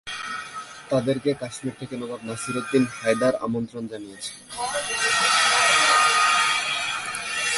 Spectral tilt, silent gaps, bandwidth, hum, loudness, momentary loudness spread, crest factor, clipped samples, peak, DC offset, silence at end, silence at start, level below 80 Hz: -2 dB/octave; none; 11.5 kHz; none; -22 LUFS; 17 LU; 18 dB; under 0.1%; -6 dBFS; under 0.1%; 0 s; 0.05 s; -62 dBFS